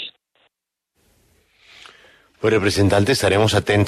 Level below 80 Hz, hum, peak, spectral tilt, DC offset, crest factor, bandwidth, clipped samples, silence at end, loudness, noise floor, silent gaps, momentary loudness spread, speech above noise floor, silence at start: -48 dBFS; none; -4 dBFS; -5 dB/octave; under 0.1%; 16 dB; 13.5 kHz; under 0.1%; 0 s; -17 LUFS; -77 dBFS; none; 6 LU; 61 dB; 0 s